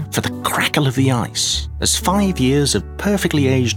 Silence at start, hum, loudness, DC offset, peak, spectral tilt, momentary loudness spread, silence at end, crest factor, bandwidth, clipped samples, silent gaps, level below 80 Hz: 0 s; none; -17 LUFS; under 0.1%; -2 dBFS; -4 dB/octave; 4 LU; 0 s; 16 dB; 19 kHz; under 0.1%; none; -32 dBFS